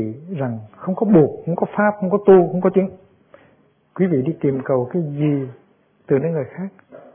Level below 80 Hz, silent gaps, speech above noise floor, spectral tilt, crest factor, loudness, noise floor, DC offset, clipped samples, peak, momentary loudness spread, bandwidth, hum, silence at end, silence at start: -60 dBFS; none; 38 dB; -13 dB/octave; 18 dB; -19 LUFS; -57 dBFS; under 0.1%; under 0.1%; -2 dBFS; 14 LU; 3.5 kHz; none; 0.15 s; 0 s